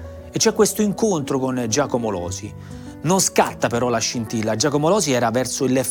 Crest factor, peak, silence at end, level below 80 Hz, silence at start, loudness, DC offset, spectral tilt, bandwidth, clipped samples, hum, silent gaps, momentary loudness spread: 18 dB; -2 dBFS; 0 s; -50 dBFS; 0 s; -20 LUFS; under 0.1%; -4 dB/octave; over 20 kHz; under 0.1%; none; none; 12 LU